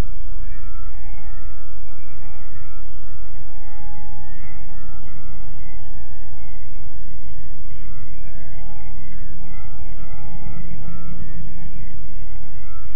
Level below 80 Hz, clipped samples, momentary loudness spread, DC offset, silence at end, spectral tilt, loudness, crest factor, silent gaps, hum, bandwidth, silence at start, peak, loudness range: -36 dBFS; under 0.1%; 5 LU; 50%; 0 s; -8.5 dB/octave; -40 LUFS; 14 dB; none; none; 3.4 kHz; 0 s; -6 dBFS; 4 LU